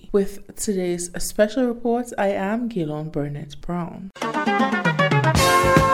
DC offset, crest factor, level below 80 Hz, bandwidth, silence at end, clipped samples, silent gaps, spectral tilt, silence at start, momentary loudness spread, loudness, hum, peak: under 0.1%; 20 dB; -38 dBFS; 17 kHz; 0 s; under 0.1%; none; -5 dB/octave; 0.05 s; 13 LU; -22 LUFS; none; -2 dBFS